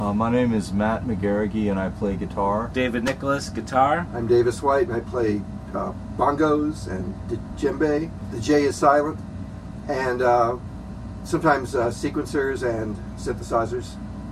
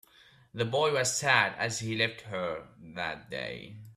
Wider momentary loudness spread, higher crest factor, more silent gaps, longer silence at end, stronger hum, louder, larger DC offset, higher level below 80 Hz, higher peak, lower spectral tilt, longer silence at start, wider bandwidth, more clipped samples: second, 12 LU vs 16 LU; about the same, 20 dB vs 24 dB; neither; about the same, 0 s vs 0.05 s; neither; first, -23 LUFS vs -30 LUFS; neither; first, -40 dBFS vs -66 dBFS; first, -4 dBFS vs -8 dBFS; first, -6.5 dB/octave vs -3 dB/octave; second, 0 s vs 0.55 s; second, 13.5 kHz vs 15.5 kHz; neither